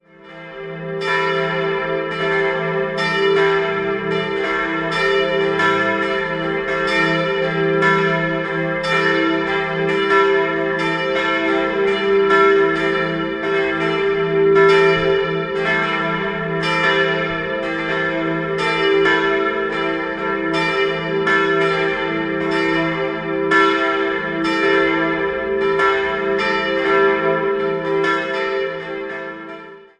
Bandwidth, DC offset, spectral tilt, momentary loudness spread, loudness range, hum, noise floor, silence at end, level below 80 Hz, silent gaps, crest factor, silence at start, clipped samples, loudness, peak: 9.4 kHz; under 0.1%; -5.5 dB/octave; 7 LU; 2 LU; none; -38 dBFS; 0.15 s; -50 dBFS; none; 16 dB; 0.25 s; under 0.1%; -17 LUFS; -2 dBFS